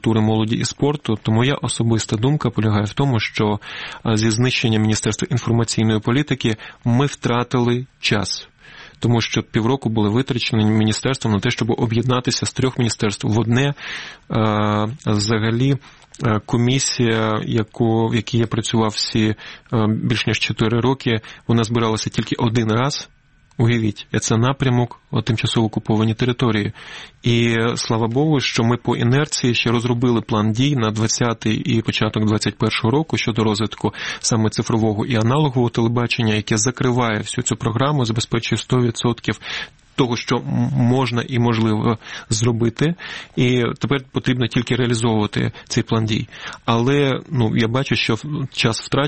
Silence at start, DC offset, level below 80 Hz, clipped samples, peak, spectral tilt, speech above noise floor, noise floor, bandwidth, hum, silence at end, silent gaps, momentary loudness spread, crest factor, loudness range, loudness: 0.05 s; 0.3%; -46 dBFS; under 0.1%; 0 dBFS; -5.5 dB/octave; 24 dB; -42 dBFS; 8.8 kHz; none; 0 s; none; 5 LU; 18 dB; 2 LU; -19 LUFS